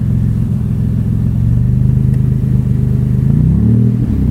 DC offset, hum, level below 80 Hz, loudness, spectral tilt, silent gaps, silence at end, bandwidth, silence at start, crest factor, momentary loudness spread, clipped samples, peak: under 0.1%; none; -20 dBFS; -13 LUFS; -11 dB/octave; none; 0 s; 3.2 kHz; 0 s; 12 dB; 4 LU; under 0.1%; 0 dBFS